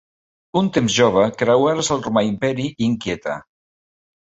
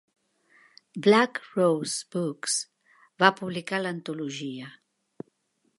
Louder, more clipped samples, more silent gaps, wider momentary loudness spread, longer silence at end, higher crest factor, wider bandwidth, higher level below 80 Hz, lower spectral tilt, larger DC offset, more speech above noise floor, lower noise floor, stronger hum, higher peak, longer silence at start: first, -19 LUFS vs -26 LUFS; neither; neither; second, 9 LU vs 23 LU; second, 0.8 s vs 1.1 s; second, 18 dB vs 26 dB; second, 8.2 kHz vs 11.5 kHz; first, -52 dBFS vs -78 dBFS; about the same, -5 dB/octave vs -4 dB/octave; neither; first, over 72 dB vs 46 dB; first, under -90 dBFS vs -72 dBFS; neither; about the same, -2 dBFS vs -2 dBFS; second, 0.55 s vs 0.95 s